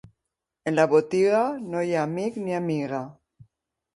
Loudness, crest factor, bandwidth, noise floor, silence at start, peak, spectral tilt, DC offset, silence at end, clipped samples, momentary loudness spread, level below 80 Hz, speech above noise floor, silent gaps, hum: -25 LUFS; 20 dB; 11.5 kHz; -84 dBFS; 0.65 s; -6 dBFS; -6.5 dB/octave; under 0.1%; 0.85 s; under 0.1%; 12 LU; -68 dBFS; 60 dB; none; none